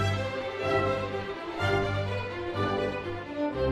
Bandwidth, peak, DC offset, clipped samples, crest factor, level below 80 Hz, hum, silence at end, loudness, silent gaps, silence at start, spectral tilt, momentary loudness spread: 11.5 kHz; -14 dBFS; under 0.1%; under 0.1%; 16 dB; -50 dBFS; none; 0 s; -30 LUFS; none; 0 s; -6.5 dB/octave; 7 LU